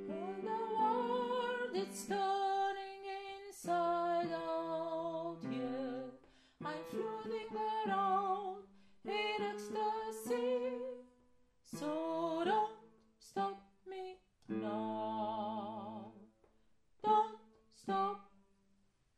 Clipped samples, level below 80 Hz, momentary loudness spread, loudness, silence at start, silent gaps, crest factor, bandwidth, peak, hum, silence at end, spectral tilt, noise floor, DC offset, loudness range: under 0.1%; -78 dBFS; 14 LU; -39 LUFS; 0 s; none; 18 dB; 13.5 kHz; -20 dBFS; none; 0.9 s; -4.5 dB/octave; -75 dBFS; under 0.1%; 4 LU